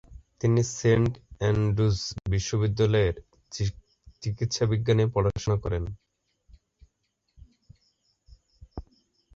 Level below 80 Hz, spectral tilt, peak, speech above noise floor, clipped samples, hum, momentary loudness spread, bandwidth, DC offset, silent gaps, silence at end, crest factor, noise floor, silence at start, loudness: -44 dBFS; -6 dB/octave; -10 dBFS; 52 dB; under 0.1%; none; 17 LU; 7.8 kHz; under 0.1%; none; 0.55 s; 18 dB; -76 dBFS; 0.1 s; -26 LUFS